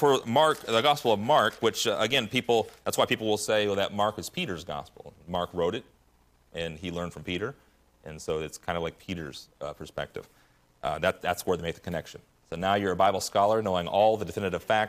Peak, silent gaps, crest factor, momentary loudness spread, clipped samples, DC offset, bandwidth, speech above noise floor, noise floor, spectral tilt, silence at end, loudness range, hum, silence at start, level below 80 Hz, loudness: -10 dBFS; none; 18 dB; 15 LU; under 0.1%; under 0.1%; 15.5 kHz; 36 dB; -64 dBFS; -4 dB/octave; 0 s; 10 LU; none; 0 s; -60 dBFS; -28 LUFS